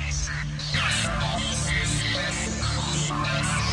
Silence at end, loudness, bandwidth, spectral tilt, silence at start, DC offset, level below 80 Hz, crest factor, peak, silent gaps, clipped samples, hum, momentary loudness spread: 0 s; -25 LUFS; 11.5 kHz; -3 dB/octave; 0 s; under 0.1%; -36 dBFS; 14 dB; -12 dBFS; none; under 0.1%; none; 4 LU